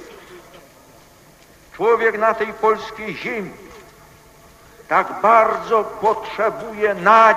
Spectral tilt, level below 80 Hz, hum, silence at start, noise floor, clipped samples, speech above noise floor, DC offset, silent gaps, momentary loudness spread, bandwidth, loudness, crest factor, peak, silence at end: -4.5 dB/octave; -56 dBFS; none; 0 s; -48 dBFS; under 0.1%; 31 dB; under 0.1%; none; 14 LU; 15.5 kHz; -18 LUFS; 20 dB; 0 dBFS; 0 s